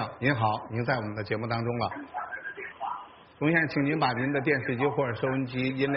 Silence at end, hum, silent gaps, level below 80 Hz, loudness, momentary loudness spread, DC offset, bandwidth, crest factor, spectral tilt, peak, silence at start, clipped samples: 0 s; none; none; -62 dBFS; -29 LUFS; 11 LU; under 0.1%; 5.6 kHz; 18 dB; -5 dB/octave; -12 dBFS; 0 s; under 0.1%